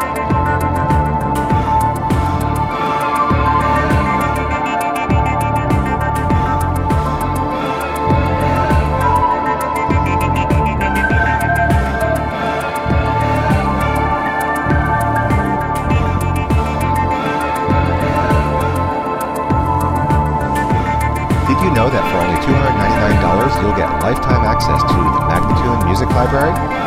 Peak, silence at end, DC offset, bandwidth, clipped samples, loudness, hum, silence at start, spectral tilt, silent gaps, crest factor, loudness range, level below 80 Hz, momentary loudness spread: 0 dBFS; 0 s; under 0.1%; 16 kHz; under 0.1%; -15 LUFS; none; 0 s; -7 dB/octave; none; 14 dB; 2 LU; -24 dBFS; 4 LU